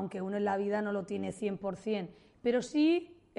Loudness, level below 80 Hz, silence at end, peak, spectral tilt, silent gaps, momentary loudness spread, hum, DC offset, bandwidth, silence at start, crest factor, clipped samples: -33 LUFS; -70 dBFS; 0.25 s; -18 dBFS; -6 dB/octave; none; 9 LU; none; under 0.1%; 11 kHz; 0 s; 14 dB; under 0.1%